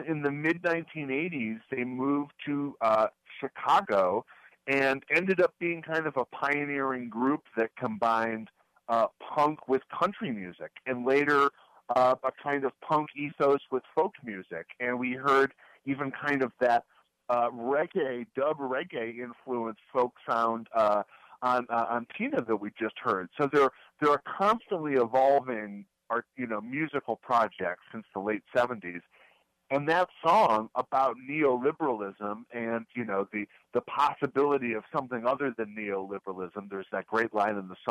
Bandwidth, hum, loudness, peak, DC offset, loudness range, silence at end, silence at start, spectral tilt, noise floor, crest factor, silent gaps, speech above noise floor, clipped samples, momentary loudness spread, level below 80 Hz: 13 kHz; none; -29 LUFS; -14 dBFS; under 0.1%; 4 LU; 0 s; 0 s; -6.5 dB/octave; -64 dBFS; 14 dB; none; 35 dB; under 0.1%; 11 LU; -74 dBFS